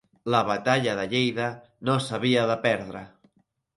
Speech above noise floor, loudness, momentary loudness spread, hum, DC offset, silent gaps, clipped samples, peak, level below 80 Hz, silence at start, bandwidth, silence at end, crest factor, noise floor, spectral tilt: 43 dB; -25 LUFS; 9 LU; none; under 0.1%; none; under 0.1%; -6 dBFS; -64 dBFS; 0.25 s; 11.5 kHz; 0.7 s; 20 dB; -68 dBFS; -5.5 dB/octave